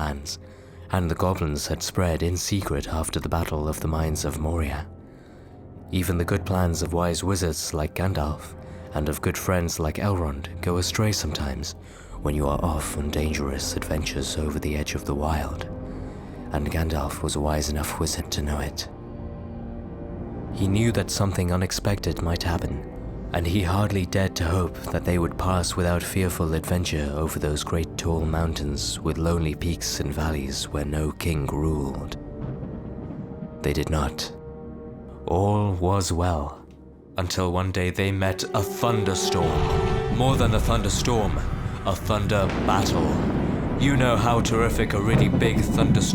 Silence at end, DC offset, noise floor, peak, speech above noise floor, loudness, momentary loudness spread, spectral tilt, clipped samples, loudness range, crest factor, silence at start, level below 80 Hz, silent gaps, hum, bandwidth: 0 s; under 0.1%; -46 dBFS; -6 dBFS; 22 dB; -25 LUFS; 13 LU; -5.5 dB/octave; under 0.1%; 5 LU; 18 dB; 0 s; -34 dBFS; none; none; 20 kHz